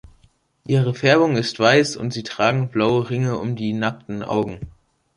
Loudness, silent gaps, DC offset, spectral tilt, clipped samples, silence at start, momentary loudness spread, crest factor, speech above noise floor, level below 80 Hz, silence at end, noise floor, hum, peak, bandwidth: -20 LUFS; none; under 0.1%; -6 dB/octave; under 0.1%; 0.7 s; 13 LU; 18 dB; 39 dB; -52 dBFS; 0.45 s; -58 dBFS; none; -2 dBFS; 11 kHz